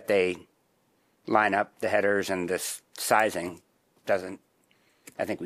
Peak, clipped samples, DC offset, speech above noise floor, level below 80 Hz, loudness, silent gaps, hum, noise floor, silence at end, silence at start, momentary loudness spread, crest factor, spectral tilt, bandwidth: -6 dBFS; under 0.1%; under 0.1%; 42 dB; -72 dBFS; -27 LUFS; none; none; -69 dBFS; 0 s; 0 s; 17 LU; 22 dB; -3.5 dB/octave; 15.5 kHz